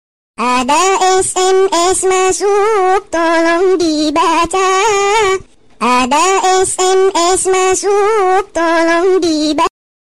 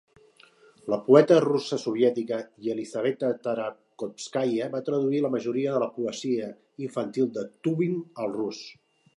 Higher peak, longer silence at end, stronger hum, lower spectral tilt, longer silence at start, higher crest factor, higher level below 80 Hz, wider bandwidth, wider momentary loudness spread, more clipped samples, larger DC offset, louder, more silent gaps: about the same, -4 dBFS vs -2 dBFS; about the same, 0.4 s vs 0.45 s; neither; second, -2 dB/octave vs -6.5 dB/octave; second, 0.35 s vs 0.85 s; second, 8 dB vs 24 dB; first, -42 dBFS vs -78 dBFS; first, 14.5 kHz vs 11 kHz; second, 3 LU vs 15 LU; neither; first, 3% vs under 0.1%; first, -12 LUFS vs -26 LUFS; neither